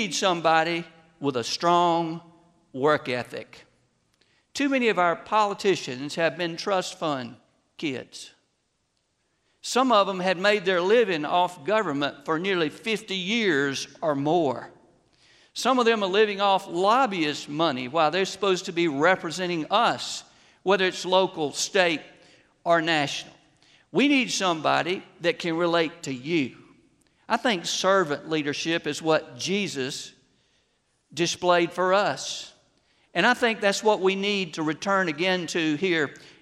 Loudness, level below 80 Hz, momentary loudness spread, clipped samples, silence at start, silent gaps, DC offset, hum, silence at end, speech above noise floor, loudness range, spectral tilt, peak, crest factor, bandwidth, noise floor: -24 LUFS; -72 dBFS; 11 LU; under 0.1%; 0 s; none; under 0.1%; none; 0.15 s; 49 dB; 4 LU; -4 dB/octave; -6 dBFS; 20 dB; 14.5 kHz; -73 dBFS